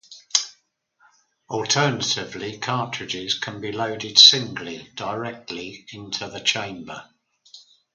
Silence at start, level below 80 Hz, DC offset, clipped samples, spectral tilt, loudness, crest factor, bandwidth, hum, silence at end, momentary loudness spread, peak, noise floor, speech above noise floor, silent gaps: 0.1 s; -64 dBFS; under 0.1%; under 0.1%; -2 dB/octave; -20 LUFS; 24 dB; 10.5 kHz; none; 0.35 s; 22 LU; 0 dBFS; -64 dBFS; 41 dB; none